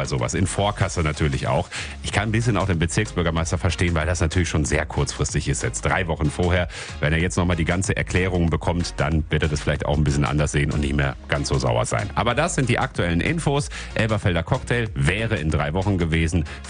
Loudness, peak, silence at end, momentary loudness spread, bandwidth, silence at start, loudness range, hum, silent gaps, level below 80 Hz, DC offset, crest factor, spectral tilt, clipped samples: -22 LUFS; -4 dBFS; 0 s; 3 LU; 10 kHz; 0 s; 1 LU; none; none; -34 dBFS; under 0.1%; 18 dB; -5 dB/octave; under 0.1%